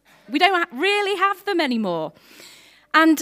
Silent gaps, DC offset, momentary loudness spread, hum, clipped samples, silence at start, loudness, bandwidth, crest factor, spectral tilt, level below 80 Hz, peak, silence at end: none; under 0.1%; 10 LU; none; under 0.1%; 0.3 s; -20 LUFS; 16 kHz; 20 dB; -3.5 dB/octave; -74 dBFS; 0 dBFS; 0 s